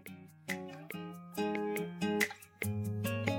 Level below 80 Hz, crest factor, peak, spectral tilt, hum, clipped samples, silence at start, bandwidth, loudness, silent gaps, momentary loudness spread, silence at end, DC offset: -74 dBFS; 22 dB; -16 dBFS; -5 dB/octave; none; under 0.1%; 0 s; 17.5 kHz; -37 LUFS; none; 11 LU; 0 s; under 0.1%